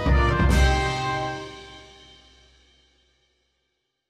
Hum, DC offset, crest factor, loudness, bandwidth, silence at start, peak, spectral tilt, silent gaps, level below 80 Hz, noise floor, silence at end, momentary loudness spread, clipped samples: none; under 0.1%; 18 dB; -23 LUFS; 12.5 kHz; 0 s; -6 dBFS; -5.5 dB/octave; none; -28 dBFS; -76 dBFS; 2.3 s; 22 LU; under 0.1%